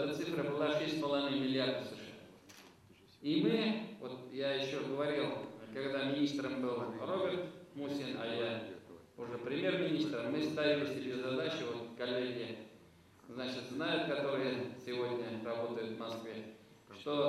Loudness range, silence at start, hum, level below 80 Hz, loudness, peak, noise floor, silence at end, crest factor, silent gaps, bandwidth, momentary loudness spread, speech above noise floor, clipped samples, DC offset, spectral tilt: 3 LU; 0 s; none; -80 dBFS; -38 LUFS; -20 dBFS; -63 dBFS; 0 s; 18 dB; none; 13.5 kHz; 15 LU; 25 dB; under 0.1%; under 0.1%; -5.5 dB/octave